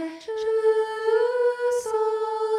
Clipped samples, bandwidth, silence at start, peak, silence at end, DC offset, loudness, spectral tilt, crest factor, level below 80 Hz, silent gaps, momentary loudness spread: under 0.1%; 12.5 kHz; 0 s; -12 dBFS; 0 s; under 0.1%; -24 LUFS; -2 dB/octave; 12 dB; -70 dBFS; none; 4 LU